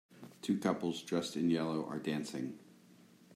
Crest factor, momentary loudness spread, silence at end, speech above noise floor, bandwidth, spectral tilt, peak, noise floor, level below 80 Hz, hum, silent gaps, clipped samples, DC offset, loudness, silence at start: 18 dB; 11 LU; 0 s; 26 dB; 15 kHz; -5.5 dB/octave; -20 dBFS; -62 dBFS; -80 dBFS; none; none; under 0.1%; under 0.1%; -37 LUFS; 0.1 s